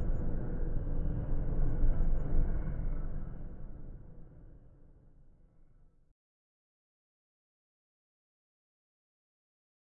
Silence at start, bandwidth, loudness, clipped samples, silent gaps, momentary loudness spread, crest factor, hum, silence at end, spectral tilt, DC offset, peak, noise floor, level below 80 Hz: 0 s; 1.8 kHz; -38 LUFS; under 0.1%; none; 19 LU; 16 dB; none; 5.45 s; -11.5 dB/octave; under 0.1%; -16 dBFS; -61 dBFS; -36 dBFS